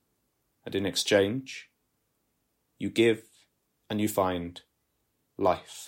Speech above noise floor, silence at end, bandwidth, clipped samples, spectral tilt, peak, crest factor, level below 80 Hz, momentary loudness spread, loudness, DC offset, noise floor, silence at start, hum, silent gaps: 49 dB; 0 s; 16 kHz; under 0.1%; -4.5 dB/octave; -10 dBFS; 22 dB; -66 dBFS; 16 LU; -28 LUFS; under 0.1%; -76 dBFS; 0.65 s; none; none